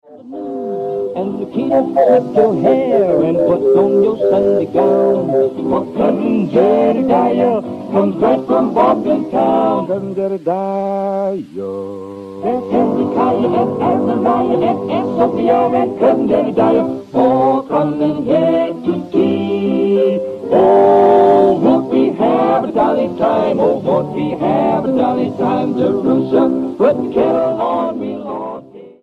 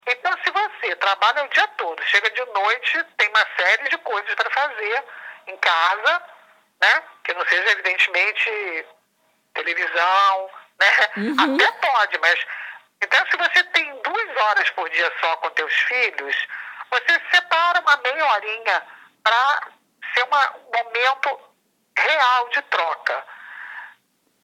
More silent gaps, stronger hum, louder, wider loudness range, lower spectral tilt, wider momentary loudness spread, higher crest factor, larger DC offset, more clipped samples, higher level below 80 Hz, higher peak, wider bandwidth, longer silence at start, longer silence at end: neither; neither; first, -14 LUFS vs -19 LUFS; about the same, 5 LU vs 3 LU; first, -9 dB/octave vs -1.5 dB/octave; about the same, 9 LU vs 11 LU; about the same, 14 dB vs 18 dB; neither; neither; first, -52 dBFS vs -88 dBFS; about the same, 0 dBFS vs -2 dBFS; second, 7.6 kHz vs 16 kHz; about the same, 0.1 s vs 0.05 s; second, 0.15 s vs 0.55 s